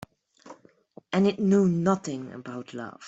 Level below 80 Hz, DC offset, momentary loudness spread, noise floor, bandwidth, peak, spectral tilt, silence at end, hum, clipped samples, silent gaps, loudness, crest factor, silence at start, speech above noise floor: -66 dBFS; under 0.1%; 16 LU; -54 dBFS; 8 kHz; -8 dBFS; -7 dB/octave; 0 s; none; under 0.1%; none; -25 LUFS; 18 dB; 0.45 s; 28 dB